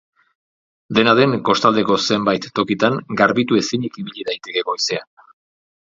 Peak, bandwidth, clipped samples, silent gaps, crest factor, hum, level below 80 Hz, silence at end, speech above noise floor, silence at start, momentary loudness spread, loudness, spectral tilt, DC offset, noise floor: 0 dBFS; 7.8 kHz; under 0.1%; none; 18 dB; none; -58 dBFS; 0.8 s; over 72 dB; 0.9 s; 11 LU; -18 LUFS; -4.5 dB/octave; under 0.1%; under -90 dBFS